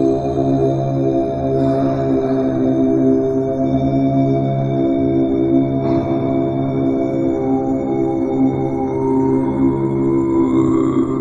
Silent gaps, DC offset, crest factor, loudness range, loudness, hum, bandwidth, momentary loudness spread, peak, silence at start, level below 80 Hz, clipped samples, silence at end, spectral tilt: none; under 0.1%; 12 dB; 1 LU; -17 LUFS; none; 7.6 kHz; 3 LU; -4 dBFS; 0 s; -40 dBFS; under 0.1%; 0 s; -10 dB/octave